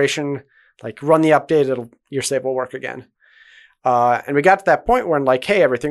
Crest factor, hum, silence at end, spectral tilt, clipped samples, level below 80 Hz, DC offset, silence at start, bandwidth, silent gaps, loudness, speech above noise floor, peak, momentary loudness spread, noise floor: 18 dB; none; 0 s; -5 dB/octave; under 0.1%; -48 dBFS; under 0.1%; 0 s; 12 kHz; none; -17 LUFS; 32 dB; 0 dBFS; 15 LU; -49 dBFS